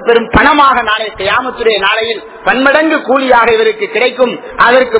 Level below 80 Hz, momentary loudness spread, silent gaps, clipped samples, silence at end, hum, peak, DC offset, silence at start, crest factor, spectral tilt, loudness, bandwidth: -34 dBFS; 6 LU; none; 2%; 0 s; none; 0 dBFS; under 0.1%; 0 s; 10 dB; -8 dB/octave; -10 LUFS; 4 kHz